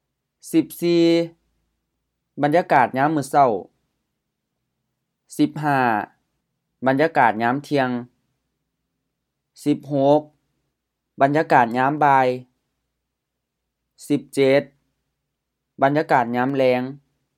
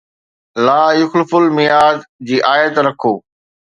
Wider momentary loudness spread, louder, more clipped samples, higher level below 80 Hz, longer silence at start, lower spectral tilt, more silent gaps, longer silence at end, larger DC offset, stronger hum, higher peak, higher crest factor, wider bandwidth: about the same, 9 LU vs 8 LU; second, -20 LUFS vs -13 LUFS; neither; second, -72 dBFS vs -62 dBFS; about the same, 0.45 s vs 0.55 s; about the same, -6.5 dB/octave vs -5.5 dB/octave; second, none vs 2.09-2.19 s; second, 0.4 s vs 0.6 s; neither; neither; about the same, 0 dBFS vs 0 dBFS; first, 22 dB vs 14 dB; first, 15 kHz vs 10 kHz